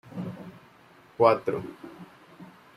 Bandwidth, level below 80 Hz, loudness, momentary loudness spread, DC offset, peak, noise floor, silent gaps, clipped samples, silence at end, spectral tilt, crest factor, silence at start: 13.5 kHz; -70 dBFS; -26 LUFS; 27 LU; under 0.1%; -6 dBFS; -55 dBFS; none; under 0.1%; 0.3 s; -7.5 dB/octave; 24 dB; 0.1 s